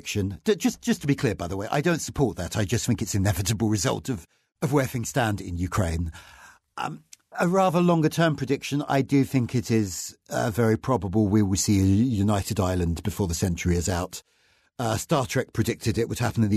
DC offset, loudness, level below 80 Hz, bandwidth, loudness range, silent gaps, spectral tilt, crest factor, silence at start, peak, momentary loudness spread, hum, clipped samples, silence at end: under 0.1%; -25 LUFS; -44 dBFS; 13.5 kHz; 4 LU; none; -5.5 dB/octave; 16 dB; 0.05 s; -10 dBFS; 10 LU; none; under 0.1%; 0 s